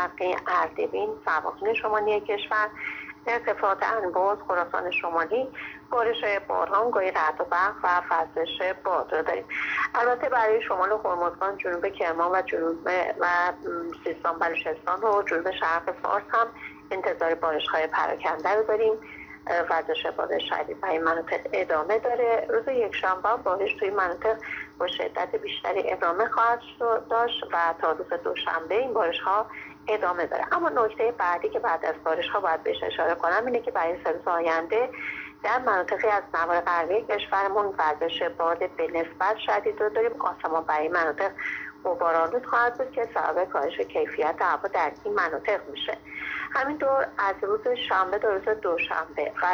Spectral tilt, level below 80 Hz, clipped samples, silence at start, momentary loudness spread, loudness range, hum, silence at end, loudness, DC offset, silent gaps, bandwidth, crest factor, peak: -4.5 dB/octave; -62 dBFS; under 0.1%; 0 s; 5 LU; 1 LU; none; 0 s; -26 LUFS; under 0.1%; none; over 20 kHz; 16 dB; -10 dBFS